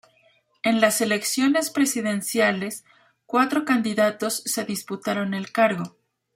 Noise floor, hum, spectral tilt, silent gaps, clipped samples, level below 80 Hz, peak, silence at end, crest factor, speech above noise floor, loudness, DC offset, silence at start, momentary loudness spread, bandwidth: -62 dBFS; none; -3.5 dB/octave; none; under 0.1%; -70 dBFS; -2 dBFS; 0.45 s; 22 dB; 39 dB; -23 LUFS; under 0.1%; 0.65 s; 9 LU; 16 kHz